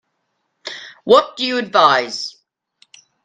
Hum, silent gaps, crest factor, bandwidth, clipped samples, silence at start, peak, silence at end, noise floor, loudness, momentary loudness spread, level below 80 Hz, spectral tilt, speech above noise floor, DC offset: none; none; 18 dB; 9.4 kHz; under 0.1%; 0.65 s; 0 dBFS; 0.95 s; -71 dBFS; -15 LUFS; 18 LU; -66 dBFS; -3 dB/octave; 56 dB; under 0.1%